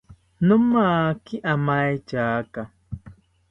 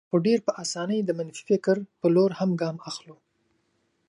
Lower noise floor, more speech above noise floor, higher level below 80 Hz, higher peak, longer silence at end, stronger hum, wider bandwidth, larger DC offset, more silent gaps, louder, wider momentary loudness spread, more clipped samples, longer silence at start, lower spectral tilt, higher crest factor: second, -48 dBFS vs -72 dBFS; second, 27 dB vs 47 dB; first, -52 dBFS vs -74 dBFS; first, -6 dBFS vs -10 dBFS; second, 0.4 s vs 0.95 s; neither; second, 6 kHz vs 11 kHz; neither; neither; first, -22 LUFS vs -25 LUFS; first, 19 LU vs 11 LU; neither; about the same, 0.1 s vs 0.15 s; first, -9 dB/octave vs -6 dB/octave; about the same, 16 dB vs 16 dB